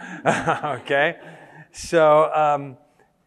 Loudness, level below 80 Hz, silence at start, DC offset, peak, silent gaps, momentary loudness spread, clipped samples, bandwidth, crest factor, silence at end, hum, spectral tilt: -20 LUFS; -56 dBFS; 0 s; under 0.1%; -2 dBFS; none; 17 LU; under 0.1%; 12.5 kHz; 18 dB; 0.5 s; none; -5 dB/octave